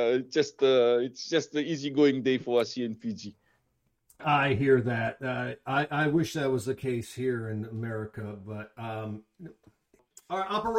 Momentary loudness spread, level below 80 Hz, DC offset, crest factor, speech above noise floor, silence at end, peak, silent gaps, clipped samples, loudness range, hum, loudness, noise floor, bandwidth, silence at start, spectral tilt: 15 LU; -64 dBFS; under 0.1%; 18 dB; 46 dB; 0 s; -12 dBFS; none; under 0.1%; 9 LU; none; -28 LUFS; -75 dBFS; 15.5 kHz; 0 s; -6 dB/octave